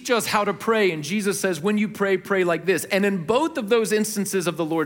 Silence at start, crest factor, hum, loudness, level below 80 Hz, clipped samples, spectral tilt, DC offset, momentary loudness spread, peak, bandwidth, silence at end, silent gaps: 0 s; 16 dB; none; -22 LUFS; -66 dBFS; under 0.1%; -4.5 dB/octave; under 0.1%; 3 LU; -6 dBFS; 17 kHz; 0 s; none